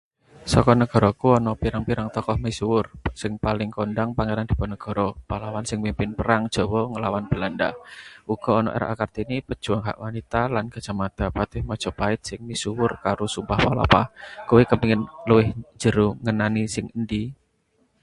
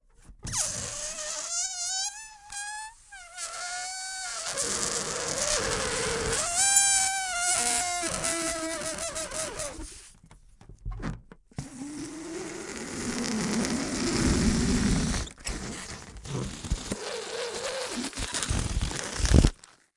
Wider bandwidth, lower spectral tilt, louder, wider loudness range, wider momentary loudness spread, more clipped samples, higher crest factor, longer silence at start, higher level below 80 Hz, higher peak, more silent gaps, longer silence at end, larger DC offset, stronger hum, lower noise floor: about the same, 11.5 kHz vs 11.5 kHz; first, -6 dB/octave vs -3 dB/octave; first, -23 LUFS vs -28 LUFS; second, 6 LU vs 12 LU; second, 11 LU vs 16 LU; neither; second, 22 dB vs 28 dB; about the same, 0.35 s vs 0.3 s; about the same, -38 dBFS vs -38 dBFS; about the same, 0 dBFS vs -2 dBFS; neither; first, 0.7 s vs 0.45 s; neither; neither; first, -66 dBFS vs -54 dBFS